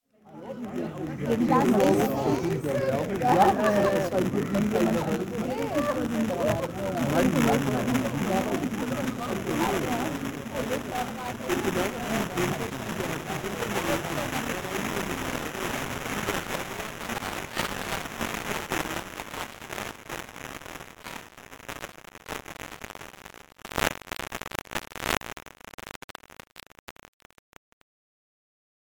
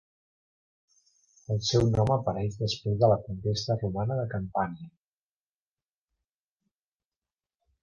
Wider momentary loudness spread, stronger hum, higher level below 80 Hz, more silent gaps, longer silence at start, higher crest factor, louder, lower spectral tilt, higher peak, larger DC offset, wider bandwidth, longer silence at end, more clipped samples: first, 18 LU vs 8 LU; neither; about the same, -50 dBFS vs -52 dBFS; first, 25.74-25.78 s, 25.96-26.08 s, 26.79-26.87 s vs none; second, 0.25 s vs 1.5 s; about the same, 26 dB vs 22 dB; about the same, -28 LUFS vs -28 LUFS; about the same, -5 dB/octave vs -6 dB/octave; first, -4 dBFS vs -10 dBFS; neither; first, 19 kHz vs 7.4 kHz; second, 2.1 s vs 2.95 s; neither